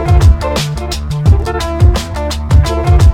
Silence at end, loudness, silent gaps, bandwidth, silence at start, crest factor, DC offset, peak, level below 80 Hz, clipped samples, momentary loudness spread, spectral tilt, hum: 0 s; -13 LUFS; none; 15 kHz; 0 s; 10 dB; under 0.1%; 0 dBFS; -14 dBFS; 0.6%; 9 LU; -6 dB/octave; none